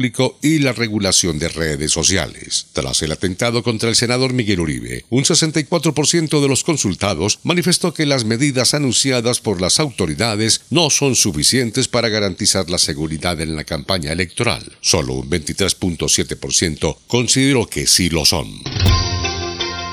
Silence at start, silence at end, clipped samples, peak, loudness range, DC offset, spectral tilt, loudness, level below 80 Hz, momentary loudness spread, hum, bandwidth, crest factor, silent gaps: 0 s; 0 s; under 0.1%; 0 dBFS; 3 LU; under 0.1%; -3.5 dB/octave; -16 LUFS; -38 dBFS; 7 LU; none; 16 kHz; 18 dB; none